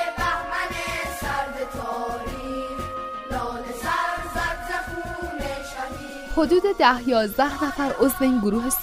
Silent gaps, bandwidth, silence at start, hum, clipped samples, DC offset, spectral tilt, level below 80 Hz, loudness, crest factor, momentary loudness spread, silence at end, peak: none; 16 kHz; 0 s; none; under 0.1%; under 0.1%; -4 dB/octave; -40 dBFS; -25 LUFS; 22 dB; 11 LU; 0 s; -2 dBFS